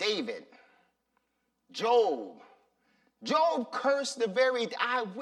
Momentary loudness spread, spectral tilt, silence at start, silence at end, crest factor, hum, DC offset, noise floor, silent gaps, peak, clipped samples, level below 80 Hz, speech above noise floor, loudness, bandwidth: 16 LU; -3 dB/octave; 0 s; 0 s; 18 dB; none; under 0.1%; -79 dBFS; none; -12 dBFS; under 0.1%; -88 dBFS; 50 dB; -29 LUFS; 12 kHz